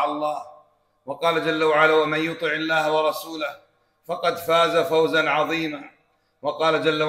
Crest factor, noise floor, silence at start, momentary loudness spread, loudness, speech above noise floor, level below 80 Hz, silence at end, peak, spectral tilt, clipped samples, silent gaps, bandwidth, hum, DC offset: 18 dB; -57 dBFS; 0 s; 13 LU; -22 LUFS; 35 dB; -66 dBFS; 0 s; -4 dBFS; -4.5 dB/octave; under 0.1%; none; 16 kHz; none; under 0.1%